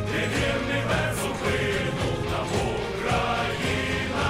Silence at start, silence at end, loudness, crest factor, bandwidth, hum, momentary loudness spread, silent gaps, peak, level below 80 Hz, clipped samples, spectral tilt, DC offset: 0 s; 0 s; -26 LUFS; 14 dB; 16 kHz; none; 3 LU; none; -12 dBFS; -40 dBFS; under 0.1%; -5 dB/octave; under 0.1%